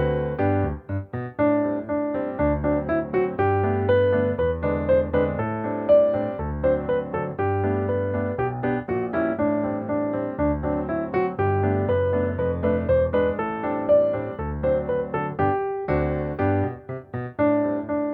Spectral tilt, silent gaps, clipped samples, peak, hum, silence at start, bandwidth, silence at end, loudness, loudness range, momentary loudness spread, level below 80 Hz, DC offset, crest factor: -11.5 dB/octave; none; under 0.1%; -8 dBFS; none; 0 s; 4.5 kHz; 0 s; -24 LUFS; 3 LU; 7 LU; -40 dBFS; under 0.1%; 16 dB